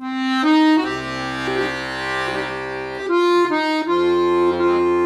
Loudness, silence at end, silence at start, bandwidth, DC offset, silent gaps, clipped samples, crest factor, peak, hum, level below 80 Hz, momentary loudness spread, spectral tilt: -19 LUFS; 0 s; 0 s; 11 kHz; under 0.1%; none; under 0.1%; 14 dB; -6 dBFS; none; -50 dBFS; 9 LU; -5 dB/octave